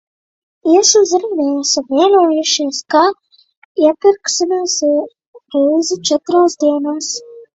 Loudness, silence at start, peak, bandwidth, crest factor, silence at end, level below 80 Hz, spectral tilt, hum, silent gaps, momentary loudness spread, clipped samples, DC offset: -14 LUFS; 0.65 s; 0 dBFS; 8.2 kHz; 14 dB; 0.1 s; -64 dBFS; -1.5 dB/octave; none; 3.57-3.75 s, 5.27-5.33 s; 11 LU; under 0.1%; under 0.1%